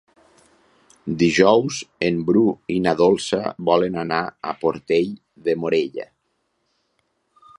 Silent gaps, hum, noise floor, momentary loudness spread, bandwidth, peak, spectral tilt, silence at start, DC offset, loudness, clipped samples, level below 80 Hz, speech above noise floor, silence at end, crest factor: none; none; -71 dBFS; 13 LU; 11 kHz; -2 dBFS; -5.5 dB/octave; 1.05 s; under 0.1%; -20 LUFS; under 0.1%; -56 dBFS; 51 dB; 1.55 s; 20 dB